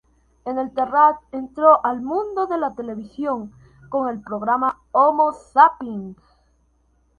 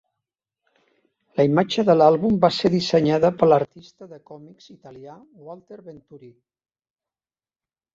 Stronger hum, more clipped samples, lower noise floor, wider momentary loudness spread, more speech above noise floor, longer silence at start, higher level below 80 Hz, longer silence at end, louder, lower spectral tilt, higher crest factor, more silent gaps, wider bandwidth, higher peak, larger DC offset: neither; neither; second, -62 dBFS vs under -90 dBFS; second, 16 LU vs 26 LU; second, 42 dB vs over 69 dB; second, 0.45 s vs 1.35 s; about the same, -58 dBFS vs -58 dBFS; second, 1.05 s vs 1.8 s; about the same, -19 LUFS vs -19 LUFS; about the same, -7 dB/octave vs -7 dB/octave; about the same, 20 dB vs 20 dB; neither; first, 9.4 kHz vs 7.8 kHz; about the same, 0 dBFS vs -2 dBFS; neither